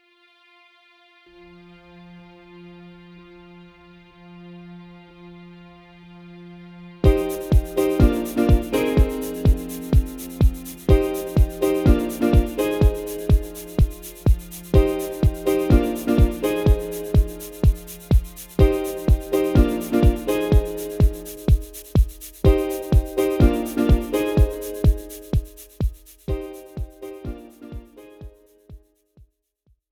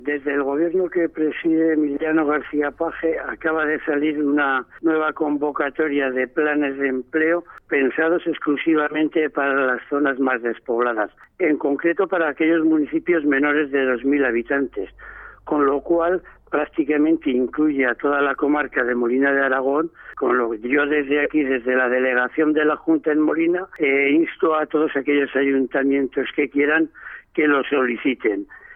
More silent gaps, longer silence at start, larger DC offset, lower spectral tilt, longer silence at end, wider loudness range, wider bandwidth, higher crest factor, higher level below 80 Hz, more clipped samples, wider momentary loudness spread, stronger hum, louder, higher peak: neither; first, 2.1 s vs 0 s; neither; about the same, -7.5 dB/octave vs -8.5 dB/octave; first, 1.15 s vs 0 s; first, 8 LU vs 2 LU; first, 18 kHz vs 3.8 kHz; about the same, 18 dB vs 14 dB; first, -24 dBFS vs -56 dBFS; neither; first, 17 LU vs 6 LU; neither; about the same, -21 LUFS vs -20 LUFS; first, -2 dBFS vs -6 dBFS